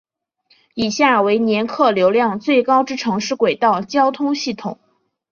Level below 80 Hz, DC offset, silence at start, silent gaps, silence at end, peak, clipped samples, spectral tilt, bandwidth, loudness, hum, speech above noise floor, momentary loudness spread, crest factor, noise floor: -60 dBFS; under 0.1%; 0.75 s; none; 0.55 s; -2 dBFS; under 0.1%; -4.5 dB/octave; 7.4 kHz; -17 LUFS; none; 44 dB; 9 LU; 16 dB; -60 dBFS